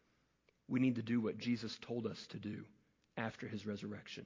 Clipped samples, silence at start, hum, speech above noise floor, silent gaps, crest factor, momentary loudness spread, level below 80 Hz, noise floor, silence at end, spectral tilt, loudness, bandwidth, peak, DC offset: under 0.1%; 0.7 s; none; 37 dB; none; 18 dB; 12 LU; -76 dBFS; -77 dBFS; 0 s; -6.5 dB/octave; -41 LUFS; 7.6 kHz; -22 dBFS; under 0.1%